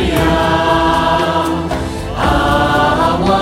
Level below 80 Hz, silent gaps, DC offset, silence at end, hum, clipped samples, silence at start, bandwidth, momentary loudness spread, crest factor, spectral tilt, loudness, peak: -26 dBFS; none; under 0.1%; 0 s; none; under 0.1%; 0 s; 16.5 kHz; 6 LU; 12 dB; -5.5 dB/octave; -13 LUFS; -2 dBFS